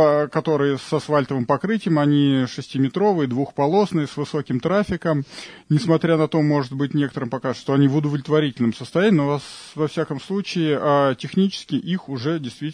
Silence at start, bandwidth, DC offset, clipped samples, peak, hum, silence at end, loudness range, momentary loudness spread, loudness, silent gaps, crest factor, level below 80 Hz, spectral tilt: 0 s; 10.5 kHz; under 0.1%; under 0.1%; -4 dBFS; none; 0 s; 2 LU; 8 LU; -21 LUFS; none; 16 dB; -56 dBFS; -7 dB/octave